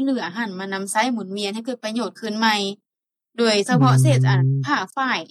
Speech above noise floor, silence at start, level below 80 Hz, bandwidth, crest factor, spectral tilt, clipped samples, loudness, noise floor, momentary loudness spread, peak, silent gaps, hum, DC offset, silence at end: 61 dB; 0 s; -78 dBFS; 13 kHz; 16 dB; -5.5 dB/octave; under 0.1%; -20 LUFS; -81 dBFS; 11 LU; -6 dBFS; none; none; under 0.1%; 0.05 s